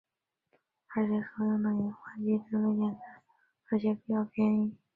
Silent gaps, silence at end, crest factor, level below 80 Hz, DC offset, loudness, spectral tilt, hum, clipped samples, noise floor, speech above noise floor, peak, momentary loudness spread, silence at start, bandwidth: none; 0.2 s; 14 dB; -72 dBFS; under 0.1%; -31 LUFS; -11 dB/octave; none; under 0.1%; -76 dBFS; 46 dB; -18 dBFS; 7 LU; 0.9 s; 4.4 kHz